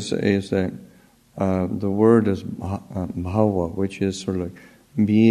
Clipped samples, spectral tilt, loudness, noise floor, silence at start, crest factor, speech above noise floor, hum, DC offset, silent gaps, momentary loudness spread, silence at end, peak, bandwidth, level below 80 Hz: under 0.1%; -7.5 dB/octave; -22 LUFS; -53 dBFS; 0 s; 18 dB; 32 dB; none; under 0.1%; none; 13 LU; 0 s; -4 dBFS; 10.5 kHz; -52 dBFS